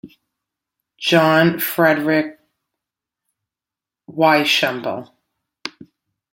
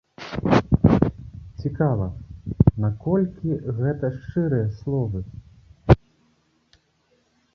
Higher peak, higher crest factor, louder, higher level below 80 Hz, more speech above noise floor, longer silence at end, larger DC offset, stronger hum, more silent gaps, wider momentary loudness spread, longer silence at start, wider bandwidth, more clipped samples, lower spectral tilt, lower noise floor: about the same, -2 dBFS vs -2 dBFS; about the same, 20 dB vs 22 dB; first, -16 LUFS vs -23 LUFS; second, -66 dBFS vs -36 dBFS; first, 72 dB vs 42 dB; second, 0.65 s vs 1.6 s; neither; neither; neither; first, 19 LU vs 16 LU; second, 0.05 s vs 0.2 s; first, 16.5 kHz vs 6.8 kHz; neither; second, -4.5 dB/octave vs -9.5 dB/octave; first, -88 dBFS vs -65 dBFS